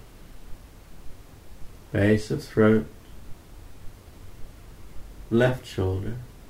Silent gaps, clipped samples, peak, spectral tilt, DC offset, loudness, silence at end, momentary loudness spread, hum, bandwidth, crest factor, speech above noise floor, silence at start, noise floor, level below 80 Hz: none; under 0.1%; -6 dBFS; -7.5 dB/octave; under 0.1%; -24 LUFS; 0 s; 27 LU; none; 16 kHz; 20 dB; 22 dB; 0.05 s; -45 dBFS; -44 dBFS